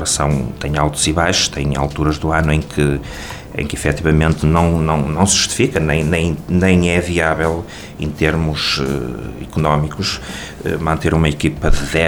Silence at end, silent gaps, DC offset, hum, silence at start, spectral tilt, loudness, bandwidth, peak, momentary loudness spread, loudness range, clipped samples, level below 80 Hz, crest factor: 0 s; none; 0.4%; none; 0 s; -4.5 dB/octave; -16 LUFS; 18.5 kHz; -2 dBFS; 11 LU; 4 LU; under 0.1%; -26 dBFS; 16 dB